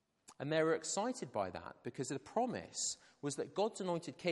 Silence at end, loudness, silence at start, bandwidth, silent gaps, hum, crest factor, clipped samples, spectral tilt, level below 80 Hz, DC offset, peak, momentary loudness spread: 0 s; -39 LUFS; 0.3 s; 11.5 kHz; none; none; 18 dB; under 0.1%; -4 dB/octave; -82 dBFS; under 0.1%; -20 dBFS; 9 LU